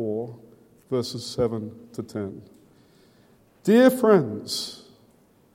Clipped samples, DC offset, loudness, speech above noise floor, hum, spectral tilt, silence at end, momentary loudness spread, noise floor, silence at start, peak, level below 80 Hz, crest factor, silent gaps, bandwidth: under 0.1%; under 0.1%; -23 LUFS; 36 dB; none; -5.5 dB/octave; 0.8 s; 20 LU; -59 dBFS; 0 s; -4 dBFS; -62 dBFS; 20 dB; none; 16.5 kHz